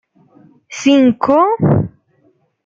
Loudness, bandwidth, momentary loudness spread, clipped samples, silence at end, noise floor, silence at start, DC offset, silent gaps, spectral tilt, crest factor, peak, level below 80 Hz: -13 LUFS; 7.6 kHz; 12 LU; under 0.1%; 0.75 s; -57 dBFS; 0.7 s; under 0.1%; none; -7 dB/octave; 14 dB; -2 dBFS; -50 dBFS